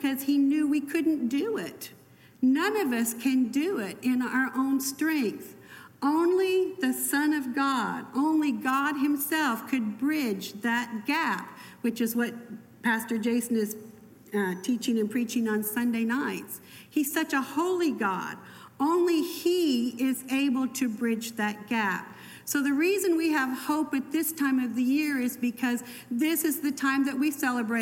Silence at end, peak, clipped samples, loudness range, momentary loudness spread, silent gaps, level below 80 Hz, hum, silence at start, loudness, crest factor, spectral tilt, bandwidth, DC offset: 0 s; -14 dBFS; under 0.1%; 3 LU; 8 LU; none; -76 dBFS; none; 0 s; -27 LUFS; 14 dB; -4 dB/octave; 17 kHz; under 0.1%